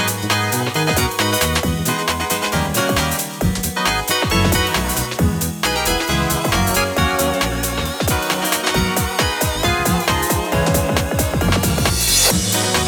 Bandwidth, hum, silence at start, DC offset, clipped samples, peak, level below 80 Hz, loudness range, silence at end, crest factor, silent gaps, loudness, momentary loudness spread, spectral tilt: over 20 kHz; none; 0 s; under 0.1%; under 0.1%; 0 dBFS; -30 dBFS; 2 LU; 0 s; 18 dB; none; -17 LUFS; 4 LU; -3.5 dB/octave